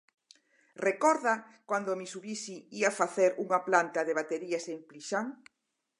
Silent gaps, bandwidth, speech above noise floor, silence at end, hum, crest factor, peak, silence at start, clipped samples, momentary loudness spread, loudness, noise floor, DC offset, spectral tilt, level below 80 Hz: none; 11.5 kHz; 33 dB; 0.65 s; none; 24 dB; -8 dBFS; 0.8 s; under 0.1%; 12 LU; -31 LUFS; -64 dBFS; under 0.1%; -3.5 dB/octave; -88 dBFS